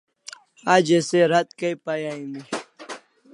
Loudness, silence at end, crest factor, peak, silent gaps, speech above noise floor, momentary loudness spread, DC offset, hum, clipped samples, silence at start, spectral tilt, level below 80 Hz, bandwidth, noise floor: -22 LUFS; 0.35 s; 22 dB; -2 dBFS; none; 24 dB; 22 LU; under 0.1%; none; under 0.1%; 0.65 s; -4.5 dB/octave; -76 dBFS; 11.5 kHz; -45 dBFS